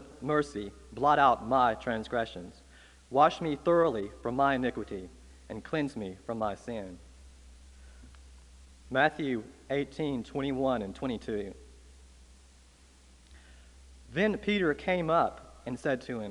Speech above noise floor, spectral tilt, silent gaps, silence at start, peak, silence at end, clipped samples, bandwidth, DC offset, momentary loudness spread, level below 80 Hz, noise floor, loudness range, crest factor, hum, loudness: 28 dB; -6 dB/octave; none; 0 s; -10 dBFS; 0 s; under 0.1%; 11.5 kHz; under 0.1%; 16 LU; -54 dBFS; -58 dBFS; 10 LU; 22 dB; none; -30 LUFS